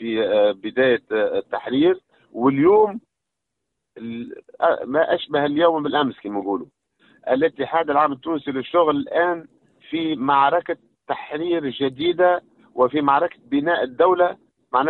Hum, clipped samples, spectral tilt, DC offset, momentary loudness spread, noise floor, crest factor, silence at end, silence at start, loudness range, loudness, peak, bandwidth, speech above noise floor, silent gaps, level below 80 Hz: none; under 0.1%; -9 dB/octave; under 0.1%; 13 LU; -82 dBFS; 16 dB; 0 s; 0 s; 2 LU; -20 LUFS; -4 dBFS; 4.3 kHz; 62 dB; none; -64 dBFS